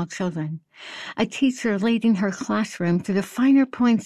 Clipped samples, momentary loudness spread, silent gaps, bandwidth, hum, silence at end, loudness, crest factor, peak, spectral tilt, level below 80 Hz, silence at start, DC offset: under 0.1%; 14 LU; none; 13 kHz; none; 0 s; -22 LUFS; 14 dB; -8 dBFS; -6 dB/octave; -64 dBFS; 0 s; under 0.1%